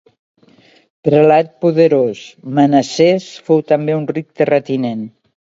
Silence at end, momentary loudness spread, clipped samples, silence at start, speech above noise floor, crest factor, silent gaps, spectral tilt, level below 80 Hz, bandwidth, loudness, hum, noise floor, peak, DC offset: 0.5 s; 10 LU; under 0.1%; 1.05 s; 35 dB; 14 dB; none; -6.5 dB/octave; -62 dBFS; 7.8 kHz; -14 LUFS; none; -49 dBFS; 0 dBFS; under 0.1%